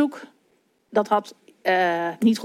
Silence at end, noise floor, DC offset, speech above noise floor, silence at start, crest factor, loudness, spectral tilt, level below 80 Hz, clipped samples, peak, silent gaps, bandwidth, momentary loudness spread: 0 s; -65 dBFS; under 0.1%; 43 dB; 0 s; 18 dB; -23 LUFS; -5.5 dB/octave; -78 dBFS; under 0.1%; -6 dBFS; none; 15 kHz; 7 LU